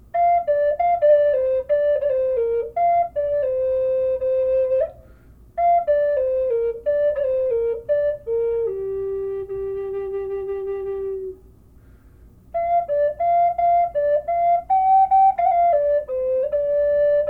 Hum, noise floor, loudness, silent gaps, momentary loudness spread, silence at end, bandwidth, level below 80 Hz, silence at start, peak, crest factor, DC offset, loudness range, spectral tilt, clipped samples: none; -48 dBFS; -20 LUFS; none; 10 LU; 0 s; 4.2 kHz; -50 dBFS; 0.15 s; -8 dBFS; 12 dB; under 0.1%; 9 LU; -8 dB/octave; under 0.1%